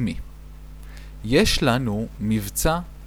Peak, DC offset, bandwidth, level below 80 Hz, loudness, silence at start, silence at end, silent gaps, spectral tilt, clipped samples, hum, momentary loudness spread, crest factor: -6 dBFS; under 0.1%; over 20 kHz; -34 dBFS; -22 LUFS; 0 s; 0 s; none; -4.5 dB/octave; under 0.1%; none; 23 LU; 18 dB